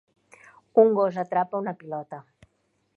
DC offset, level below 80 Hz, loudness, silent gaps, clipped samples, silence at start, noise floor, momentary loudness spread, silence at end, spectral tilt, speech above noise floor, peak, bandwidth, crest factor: under 0.1%; -74 dBFS; -24 LUFS; none; under 0.1%; 0.75 s; -72 dBFS; 18 LU; 0.75 s; -8.5 dB/octave; 48 dB; -6 dBFS; 6.6 kHz; 20 dB